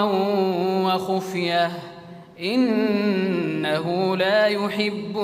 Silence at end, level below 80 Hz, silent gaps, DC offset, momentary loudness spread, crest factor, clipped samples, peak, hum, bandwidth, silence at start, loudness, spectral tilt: 0 s; -68 dBFS; none; under 0.1%; 6 LU; 14 dB; under 0.1%; -8 dBFS; none; 16 kHz; 0 s; -22 LUFS; -6 dB/octave